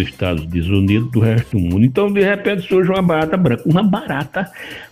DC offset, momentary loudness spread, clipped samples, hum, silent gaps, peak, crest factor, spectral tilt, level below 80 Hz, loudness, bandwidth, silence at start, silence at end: under 0.1%; 7 LU; under 0.1%; none; none; 0 dBFS; 14 dB; -8 dB/octave; -38 dBFS; -16 LUFS; 15 kHz; 0 s; 0.05 s